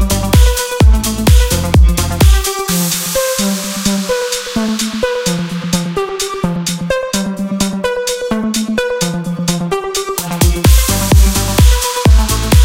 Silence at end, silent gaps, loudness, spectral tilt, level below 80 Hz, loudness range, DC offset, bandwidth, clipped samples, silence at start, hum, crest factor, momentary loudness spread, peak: 0 s; none; -13 LUFS; -4.5 dB/octave; -16 dBFS; 5 LU; under 0.1%; 17 kHz; under 0.1%; 0 s; none; 12 dB; 7 LU; 0 dBFS